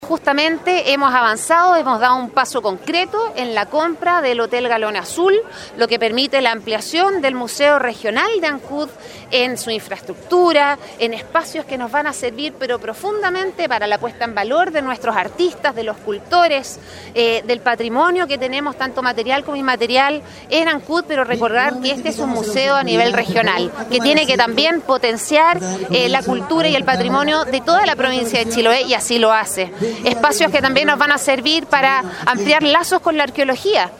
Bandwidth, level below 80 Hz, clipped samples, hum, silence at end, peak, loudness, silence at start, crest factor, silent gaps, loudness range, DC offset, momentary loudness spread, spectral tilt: 16.5 kHz; -54 dBFS; under 0.1%; none; 0 s; 0 dBFS; -16 LUFS; 0 s; 16 dB; none; 4 LU; under 0.1%; 8 LU; -3 dB/octave